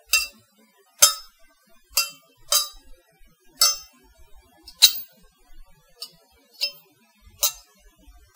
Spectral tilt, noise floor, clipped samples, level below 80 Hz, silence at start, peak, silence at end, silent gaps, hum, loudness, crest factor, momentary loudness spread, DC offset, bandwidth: 3.5 dB/octave; -59 dBFS; under 0.1%; -56 dBFS; 0.15 s; 0 dBFS; 0.8 s; none; none; -20 LUFS; 28 dB; 24 LU; under 0.1%; 16 kHz